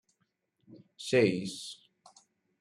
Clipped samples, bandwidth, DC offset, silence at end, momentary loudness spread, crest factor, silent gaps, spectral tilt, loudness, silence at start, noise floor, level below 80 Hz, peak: under 0.1%; 13.5 kHz; under 0.1%; 0.85 s; 18 LU; 22 dB; none; -5 dB/octave; -30 LUFS; 0.7 s; -78 dBFS; -74 dBFS; -14 dBFS